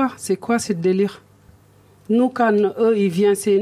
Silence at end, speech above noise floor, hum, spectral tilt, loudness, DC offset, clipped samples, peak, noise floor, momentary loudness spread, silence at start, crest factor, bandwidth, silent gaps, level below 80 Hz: 0 s; 33 dB; none; -6 dB/octave; -19 LUFS; under 0.1%; under 0.1%; -6 dBFS; -51 dBFS; 5 LU; 0 s; 14 dB; 14.5 kHz; none; -60 dBFS